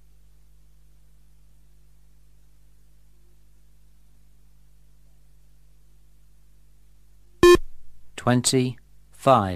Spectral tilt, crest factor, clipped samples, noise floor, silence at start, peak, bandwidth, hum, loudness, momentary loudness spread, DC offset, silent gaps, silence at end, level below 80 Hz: -5 dB/octave; 24 dB; under 0.1%; -57 dBFS; 7.45 s; -2 dBFS; 15 kHz; 50 Hz at -55 dBFS; -20 LUFS; 17 LU; 0.3%; none; 0 s; -44 dBFS